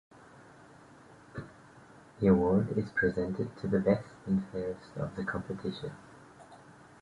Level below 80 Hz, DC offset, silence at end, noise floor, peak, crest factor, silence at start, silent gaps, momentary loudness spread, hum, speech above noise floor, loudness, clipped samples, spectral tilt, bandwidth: -56 dBFS; under 0.1%; 0.3 s; -55 dBFS; -12 dBFS; 20 dB; 1.1 s; none; 21 LU; none; 25 dB; -31 LUFS; under 0.1%; -8.5 dB/octave; 10.5 kHz